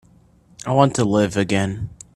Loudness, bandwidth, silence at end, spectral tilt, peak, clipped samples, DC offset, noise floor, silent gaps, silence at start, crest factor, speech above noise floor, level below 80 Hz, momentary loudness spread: -19 LUFS; 12.5 kHz; 0.25 s; -6 dB/octave; 0 dBFS; under 0.1%; under 0.1%; -53 dBFS; none; 0.65 s; 20 dB; 34 dB; -48 dBFS; 12 LU